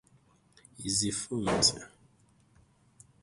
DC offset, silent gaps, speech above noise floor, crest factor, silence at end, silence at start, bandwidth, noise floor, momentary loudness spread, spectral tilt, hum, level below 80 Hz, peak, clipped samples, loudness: under 0.1%; none; 35 dB; 26 dB; 1.35 s; 0.8 s; 11.5 kHz; -65 dBFS; 19 LU; -2.5 dB/octave; none; -58 dBFS; -10 dBFS; under 0.1%; -29 LUFS